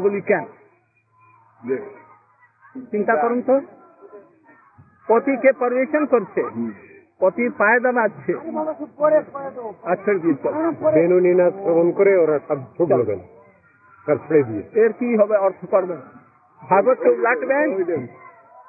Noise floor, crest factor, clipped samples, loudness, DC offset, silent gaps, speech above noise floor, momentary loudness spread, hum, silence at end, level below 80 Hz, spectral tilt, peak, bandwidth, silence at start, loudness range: -60 dBFS; 16 dB; under 0.1%; -19 LUFS; under 0.1%; none; 42 dB; 14 LU; none; 0.4 s; -74 dBFS; -13 dB/octave; -4 dBFS; 2.8 kHz; 0 s; 7 LU